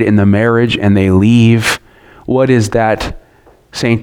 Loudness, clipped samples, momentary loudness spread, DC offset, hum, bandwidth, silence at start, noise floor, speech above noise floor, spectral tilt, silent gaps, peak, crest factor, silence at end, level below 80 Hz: -11 LUFS; under 0.1%; 12 LU; under 0.1%; none; 16.5 kHz; 0 s; -46 dBFS; 36 dB; -6.5 dB/octave; none; 0 dBFS; 12 dB; 0 s; -36 dBFS